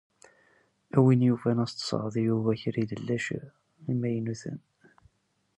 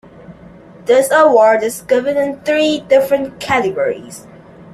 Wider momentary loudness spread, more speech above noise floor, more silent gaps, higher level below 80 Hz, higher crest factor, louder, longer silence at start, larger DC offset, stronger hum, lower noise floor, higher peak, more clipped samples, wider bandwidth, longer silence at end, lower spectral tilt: first, 16 LU vs 13 LU; first, 47 dB vs 25 dB; neither; second, -66 dBFS vs -52 dBFS; first, 20 dB vs 14 dB; second, -28 LUFS vs -14 LUFS; first, 0.95 s vs 0.3 s; neither; neither; first, -74 dBFS vs -39 dBFS; second, -8 dBFS vs 0 dBFS; neither; second, 11 kHz vs 14.5 kHz; first, 1 s vs 0.55 s; first, -7 dB/octave vs -4 dB/octave